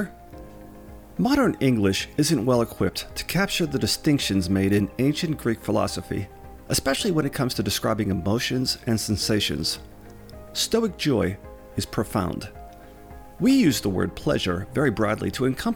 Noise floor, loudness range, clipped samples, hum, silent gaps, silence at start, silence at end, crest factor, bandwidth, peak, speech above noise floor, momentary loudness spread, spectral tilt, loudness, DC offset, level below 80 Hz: -43 dBFS; 3 LU; under 0.1%; none; none; 0 s; 0 s; 16 dB; 19.5 kHz; -8 dBFS; 20 dB; 13 LU; -5 dB/octave; -24 LUFS; under 0.1%; -46 dBFS